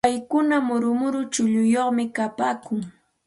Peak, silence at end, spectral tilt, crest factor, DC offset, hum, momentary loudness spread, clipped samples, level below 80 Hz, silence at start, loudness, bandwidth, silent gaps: -6 dBFS; 0.35 s; -4.5 dB/octave; 16 dB; under 0.1%; none; 9 LU; under 0.1%; -62 dBFS; 0.05 s; -23 LUFS; 11.5 kHz; none